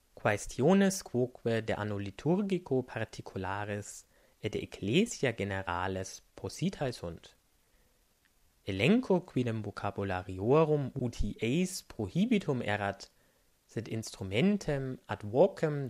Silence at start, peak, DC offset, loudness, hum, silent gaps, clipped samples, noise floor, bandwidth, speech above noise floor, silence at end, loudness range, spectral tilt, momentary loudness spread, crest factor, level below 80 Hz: 0.25 s; -12 dBFS; under 0.1%; -32 LUFS; none; none; under 0.1%; -70 dBFS; 15 kHz; 38 dB; 0 s; 4 LU; -6 dB/octave; 13 LU; 20 dB; -54 dBFS